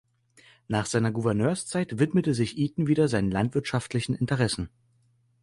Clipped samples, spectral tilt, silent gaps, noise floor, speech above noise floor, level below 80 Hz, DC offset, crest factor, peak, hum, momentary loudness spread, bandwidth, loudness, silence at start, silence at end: under 0.1%; -6 dB/octave; none; -66 dBFS; 40 dB; -52 dBFS; under 0.1%; 18 dB; -10 dBFS; none; 6 LU; 11.5 kHz; -26 LUFS; 0.7 s; 0.75 s